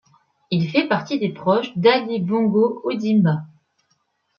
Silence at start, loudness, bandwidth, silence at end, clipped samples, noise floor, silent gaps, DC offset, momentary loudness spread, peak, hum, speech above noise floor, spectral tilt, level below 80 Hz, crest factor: 0.5 s; -20 LUFS; 6.8 kHz; 0.95 s; under 0.1%; -68 dBFS; none; under 0.1%; 7 LU; -4 dBFS; none; 49 dB; -7.5 dB/octave; -66 dBFS; 18 dB